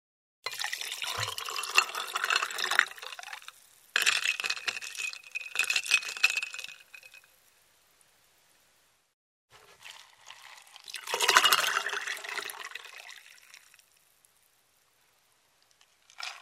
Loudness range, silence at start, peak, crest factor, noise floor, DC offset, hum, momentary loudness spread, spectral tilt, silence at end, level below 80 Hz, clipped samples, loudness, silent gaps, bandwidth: 15 LU; 0.45 s; -2 dBFS; 32 dB; -69 dBFS; under 0.1%; none; 24 LU; 1.5 dB/octave; 0 s; -80 dBFS; under 0.1%; -28 LUFS; 9.13-9.48 s; 16 kHz